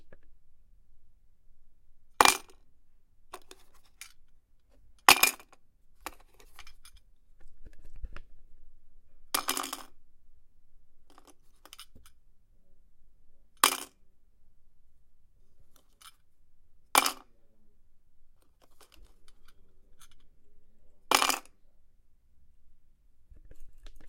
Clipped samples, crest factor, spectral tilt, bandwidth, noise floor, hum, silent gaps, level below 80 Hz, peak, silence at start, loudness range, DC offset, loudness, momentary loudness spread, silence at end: under 0.1%; 34 dB; 0.5 dB/octave; 16.5 kHz; -58 dBFS; none; none; -56 dBFS; -2 dBFS; 0 s; 10 LU; under 0.1%; -26 LUFS; 29 LU; 0 s